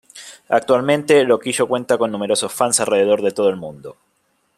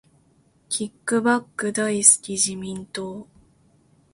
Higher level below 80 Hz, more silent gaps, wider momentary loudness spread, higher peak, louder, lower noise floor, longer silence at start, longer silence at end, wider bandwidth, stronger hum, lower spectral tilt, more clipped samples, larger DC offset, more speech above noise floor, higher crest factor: about the same, -64 dBFS vs -64 dBFS; neither; about the same, 16 LU vs 18 LU; about the same, -2 dBFS vs 0 dBFS; first, -17 LUFS vs -21 LUFS; first, -65 dBFS vs -60 dBFS; second, 0.15 s vs 0.7 s; second, 0.65 s vs 0.9 s; first, 14 kHz vs 11.5 kHz; neither; about the same, -3.5 dB/octave vs -2.5 dB/octave; neither; neither; first, 48 dB vs 38 dB; second, 16 dB vs 24 dB